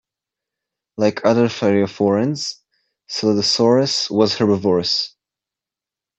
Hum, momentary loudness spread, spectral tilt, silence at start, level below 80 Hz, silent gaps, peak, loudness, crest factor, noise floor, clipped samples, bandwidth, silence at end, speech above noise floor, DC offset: none; 10 LU; -5 dB/octave; 1 s; -64 dBFS; none; -2 dBFS; -18 LUFS; 16 dB; -88 dBFS; under 0.1%; 8.4 kHz; 1.1 s; 71 dB; under 0.1%